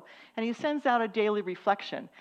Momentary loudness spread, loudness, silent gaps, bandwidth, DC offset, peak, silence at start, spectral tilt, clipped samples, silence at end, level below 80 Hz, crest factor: 9 LU; -30 LUFS; none; 8.6 kHz; under 0.1%; -12 dBFS; 0.1 s; -5.5 dB/octave; under 0.1%; 0.15 s; -86 dBFS; 18 dB